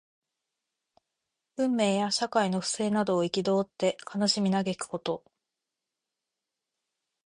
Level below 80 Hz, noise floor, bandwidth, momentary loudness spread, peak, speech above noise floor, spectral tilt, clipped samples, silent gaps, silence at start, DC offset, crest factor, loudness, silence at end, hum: -72 dBFS; -87 dBFS; 11 kHz; 8 LU; -12 dBFS; 60 dB; -4.5 dB/octave; under 0.1%; none; 1.6 s; under 0.1%; 18 dB; -28 LUFS; 2.05 s; none